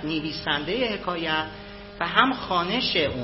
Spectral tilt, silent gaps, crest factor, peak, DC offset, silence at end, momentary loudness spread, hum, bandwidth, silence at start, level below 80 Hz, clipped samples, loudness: -7.5 dB/octave; none; 24 dB; -2 dBFS; under 0.1%; 0 s; 11 LU; none; 6 kHz; 0 s; -48 dBFS; under 0.1%; -24 LUFS